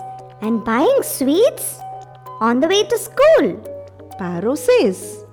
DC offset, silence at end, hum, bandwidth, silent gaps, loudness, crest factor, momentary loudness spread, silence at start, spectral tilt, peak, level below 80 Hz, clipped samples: under 0.1%; 0.05 s; none; 19 kHz; none; -17 LUFS; 12 dB; 21 LU; 0 s; -4 dB/octave; -6 dBFS; -52 dBFS; under 0.1%